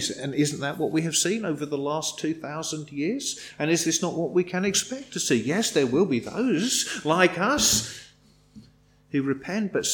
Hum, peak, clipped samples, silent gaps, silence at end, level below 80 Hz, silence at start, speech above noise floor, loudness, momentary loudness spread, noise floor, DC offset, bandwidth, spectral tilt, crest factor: 50 Hz at -55 dBFS; -6 dBFS; under 0.1%; none; 0 s; -58 dBFS; 0 s; 32 dB; -25 LUFS; 10 LU; -57 dBFS; under 0.1%; 19 kHz; -3 dB/octave; 20 dB